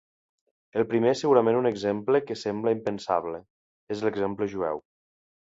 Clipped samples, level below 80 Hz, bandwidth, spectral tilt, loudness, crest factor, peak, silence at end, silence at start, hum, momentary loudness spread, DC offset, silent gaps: under 0.1%; -64 dBFS; 7.8 kHz; -6.5 dB/octave; -26 LUFS; 20 dB; -6 dBFS; 0.8 s; 0.75 s; none; 12 LU; under 0.1%; 3.50-3.87 s